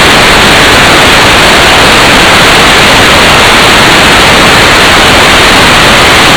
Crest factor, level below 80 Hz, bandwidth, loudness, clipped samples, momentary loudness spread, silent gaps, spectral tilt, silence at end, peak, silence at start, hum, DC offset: 2 dB; -18 dBFS; over 20 kHz; 0 LUFS; 50%; 0 LU; none; -2.5 dB/octave; 0 s; 0 dBFS; 0 s; none; 0.8%